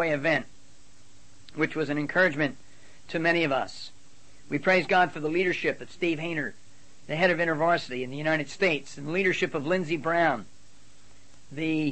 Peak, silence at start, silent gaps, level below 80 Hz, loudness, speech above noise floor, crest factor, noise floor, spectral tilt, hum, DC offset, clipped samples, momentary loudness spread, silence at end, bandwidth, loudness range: -10 dBFS; 0 s; none; -64 dBFS; -27 LUFS; 31 dB; 18 dB; -57 dBFS; -5.5 dB/octave; none; 0.8%; under 0.1%; 10 LU; 0 s; 8.8 kHz; 2 LU